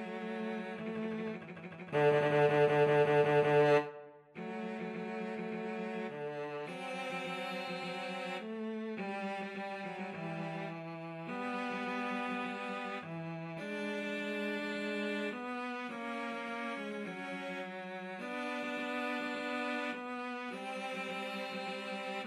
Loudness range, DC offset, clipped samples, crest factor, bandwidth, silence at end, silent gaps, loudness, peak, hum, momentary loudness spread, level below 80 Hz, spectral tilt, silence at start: 10 LU; under 0.1%; under 0.1%; 20 dB; 12.5 kHz; 0 s; none; -36 LUFS; -18 dBFS; none; 14 LU; -86 dBFS; -6 dB/octave; 0 s